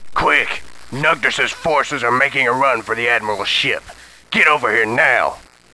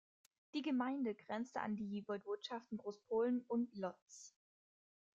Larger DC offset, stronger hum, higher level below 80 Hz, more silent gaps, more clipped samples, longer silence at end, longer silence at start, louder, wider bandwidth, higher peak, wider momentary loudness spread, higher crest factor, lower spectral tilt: neither; neither; first, -48 dBFS vs -86 dBFS; second, none vs 4.02-4.07 s; neither; second, 0.3 s vs 0.85 s; second, 0 s vs 0.55 s; first, -15 LUFS vs -43 LUFS; first, 11 kHz vs 7.8 kHz; first, 0 dBFS vs -28 dBFS; second, 7 LU vs 10 LU; about the same, 18 dB vs 16 dB; second, -3 dB/octave vs -5.5 dB/octave